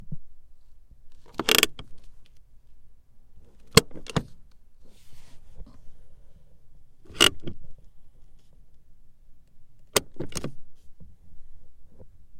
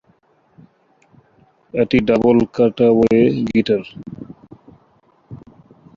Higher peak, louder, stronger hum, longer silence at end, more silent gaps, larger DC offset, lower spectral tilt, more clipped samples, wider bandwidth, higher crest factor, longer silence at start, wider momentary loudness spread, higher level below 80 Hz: about the same, 0 dBFS vs -2 dBFS; second, -24 LUFS vs -16 LUFS; neither; second, 0 s vs 0.6 s; neither; neither; second, -2.5 dB/octave vs -8 dB/octave; neither; first, 16.5 kHz vs 7.2 kHz; first, 30 dB vs 16 dB; second, 0 s vs 1.75 s; first, 26 LU vs 21 LU; about the same, -48 dBFS vs -48 dBFS